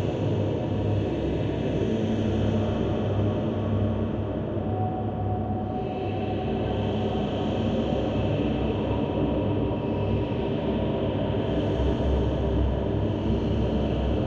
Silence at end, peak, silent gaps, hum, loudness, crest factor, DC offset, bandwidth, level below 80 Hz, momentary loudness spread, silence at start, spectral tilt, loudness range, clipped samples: 0 s; -12 dBFS; none; none; -27 LUFS; 14 dB; under 0.1%; 7.2 kHz; -36 dBFS; 3 LU; 0 s; -9 dB/octave; 2 LU; under 0.1%